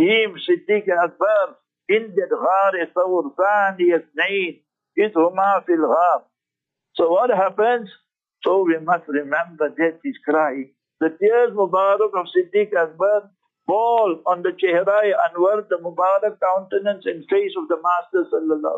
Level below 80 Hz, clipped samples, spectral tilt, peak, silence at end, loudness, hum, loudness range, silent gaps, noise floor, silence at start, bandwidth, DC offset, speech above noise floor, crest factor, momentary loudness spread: -80 dBFS; under 0.1%; -6.5 dB/octave; -6 dBFS; 0 s; -20 LUFS; none; 2 LU; none; -85 dBFS; 0 s; 7.6 kHz; under 0.1%; 66 dB; 14 dB; 7 LU